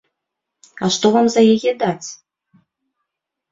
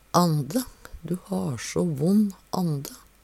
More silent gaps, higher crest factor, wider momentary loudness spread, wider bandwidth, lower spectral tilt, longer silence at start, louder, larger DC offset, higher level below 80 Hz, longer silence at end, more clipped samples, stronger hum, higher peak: neither; about the same, 18 dB vs 20 dB; about the same, 13 LU vs 12 LU; second, 7.8 kHz vs 15.5 kHz; second, -4.5 dB/octave vs -6.5 dB/octave; first, 0.8 s vs 0.15 s; first, -16 LUFS vs -26 LUFS; neither; second, -62 dBFS vs -54 dBFS; first, 1.4 s vs 0.25 s; neither; neither; first, -2 dBFS vs -6 dBFS